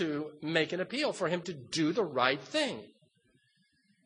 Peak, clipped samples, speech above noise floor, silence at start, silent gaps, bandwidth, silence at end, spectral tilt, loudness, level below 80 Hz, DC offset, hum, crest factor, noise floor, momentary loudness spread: -10 dBFS; under 0.1%; 40 dB; 0 s; none; 10 kHz; 1.2 s; -4.5 dB/octave; -32 LUFS; -78 dBFS; under 0.1%; none; 24 dB; -72 dBFS; 7 LU